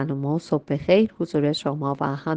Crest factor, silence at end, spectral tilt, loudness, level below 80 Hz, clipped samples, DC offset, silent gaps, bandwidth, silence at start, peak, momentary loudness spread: 18 dB; 0 s; -7.5 dB/octave; -23 LUFS; -56 dBFS; under 0.1%; under 0.1%; none; 9.4 kHz; 0 s; -4 dBFS; 7 LU